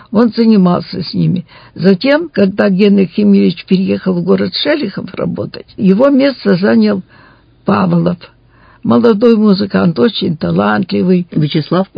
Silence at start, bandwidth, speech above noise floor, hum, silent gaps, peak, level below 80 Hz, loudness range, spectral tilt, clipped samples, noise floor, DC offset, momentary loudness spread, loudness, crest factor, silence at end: 0.1 s; 5.2 kHz; 19 dB; none; none; 0 dBFS; -48 dBFS; 2 LU; -9.5 dB/octave; 0.3%; -30 dBFS; under 0.1%; 10 LU; -12 LUFS; 12 dB; 0.1 s